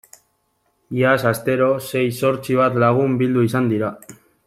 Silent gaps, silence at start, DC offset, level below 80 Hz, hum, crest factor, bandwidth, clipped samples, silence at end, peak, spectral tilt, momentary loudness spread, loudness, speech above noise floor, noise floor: none; 0.9 s; under 0.1%; -58 dBFS; none; 18 dB; 16 kHz; under 0.1%; 0.35 s; -2 dBFS; -6.5 dB/octave; 5 LU; -18 LUFS; 49 dB; -67 dBFS